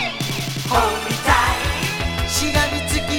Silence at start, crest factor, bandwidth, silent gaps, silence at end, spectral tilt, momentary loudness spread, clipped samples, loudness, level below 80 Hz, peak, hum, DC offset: 0 s; 20 dB; 19 kHz; none; 0 s; -3.5 dB/octave; 6 LU; under 0.1%; -19 LUFS; -30 dBFS; 0 dBFS; none; under 0.1%